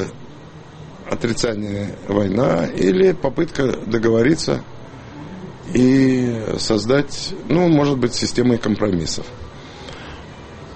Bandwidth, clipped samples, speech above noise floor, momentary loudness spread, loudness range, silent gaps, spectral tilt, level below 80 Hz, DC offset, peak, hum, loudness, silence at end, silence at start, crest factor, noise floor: 8.8 kHz; under 0.1%; 21 dB; 21 LU; 2 LU; none; -6 dB/octave; -42 dBFS; under 0.1%; -4 dBFS; none; -18 LUFS; 0 s; 0 s; 16 dB; -38 dBFS